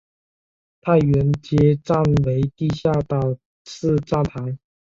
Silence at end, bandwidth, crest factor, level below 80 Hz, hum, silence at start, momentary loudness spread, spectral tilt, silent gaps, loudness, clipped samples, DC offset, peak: 0.3 s; 7.4 kHz; 16 dB; -42 dBFS; none; 0.85 s; 12 LU; -8.5 dB/octave; 3.45-3.65 s; -20 LUFS; under 0.1%; under 0.1%; -4 dBFS